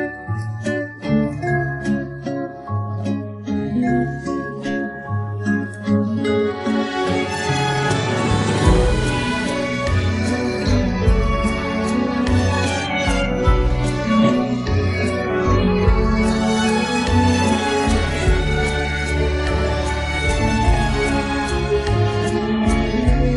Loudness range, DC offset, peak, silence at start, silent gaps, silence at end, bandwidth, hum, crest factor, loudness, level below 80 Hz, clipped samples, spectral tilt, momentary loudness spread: 5 LU; under 0.1%; -2 dBFS; 0 s; none; 0 s; 11.5 kHz; none; 16 dB; -19 LUFS; -26 dBFS; under 0.1%; -6 dB/octave; 8 LU